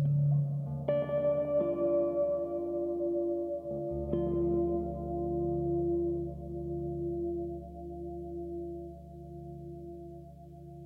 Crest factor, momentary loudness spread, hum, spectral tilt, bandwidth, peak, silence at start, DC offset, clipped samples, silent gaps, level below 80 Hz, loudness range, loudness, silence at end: 14 dB; 16 LU; none; -11.5 dB/octave; 3.4 kHz; -18 dBFS; 0 s; under 0.1%; under 0.1%; none; -50 dBFS; 9 LU; -33 LUFS; 0 s